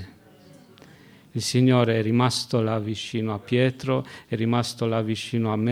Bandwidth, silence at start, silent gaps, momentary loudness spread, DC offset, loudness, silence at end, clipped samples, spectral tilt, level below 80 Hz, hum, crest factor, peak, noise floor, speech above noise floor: 15 kHz; 0 s; none; 9 LU; under 0.1%; -24 LUFS; 0 s; under 0.1%; -6 dB/octave; -64 dBFS; none; 20 dB; -6 dBFS; -51 dBFS; 27 dB